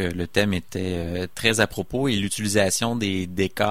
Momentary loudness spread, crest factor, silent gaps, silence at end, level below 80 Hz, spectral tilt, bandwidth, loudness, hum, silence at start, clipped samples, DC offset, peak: 7 LU; 20 dB; none; 0 s; -46 dBFS; -4 dB/octave; 16 kHz; -23 LUFS; none; 0 s; under 0.1%; 0.9%; -4 dBFS